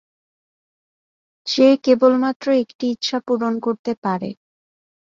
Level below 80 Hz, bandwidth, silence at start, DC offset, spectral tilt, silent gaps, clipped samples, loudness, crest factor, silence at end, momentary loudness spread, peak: -66 dBFS; 7.4 kHz; 1.45 s; under 0.1%; -5 dB/octave; 2.36-2.40 s, 2.75-2.79 s, 3.79-3.85 s, 3.97-4.02 s; under 0.1%; -19 LUFS; 18 dB; 0.8 s; 10 LU; -2 dBFS